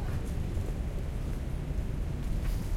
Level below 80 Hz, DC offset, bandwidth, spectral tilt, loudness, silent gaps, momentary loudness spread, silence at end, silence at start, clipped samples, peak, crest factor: -34 dBFS; under 0.1%; 15.5 kHz; -7 dB/octave; -36 LUFS; none; 2 LU; 0 s; 0 s; under 0.1%; -20 dBFS; 12 dB